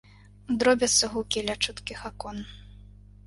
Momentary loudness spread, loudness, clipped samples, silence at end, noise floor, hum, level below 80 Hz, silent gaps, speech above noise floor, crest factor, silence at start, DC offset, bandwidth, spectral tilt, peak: 17 LU; -25 LUFS; under 0.1%; 0.65 s; -49 dBFS; 50 Hz at -45 dBFS; -50 dBFS; none; 22 dB; 22 dB; 0.5 s; under 0.1%; 11.5 kHz; -2 dB/octave; -6 dBFS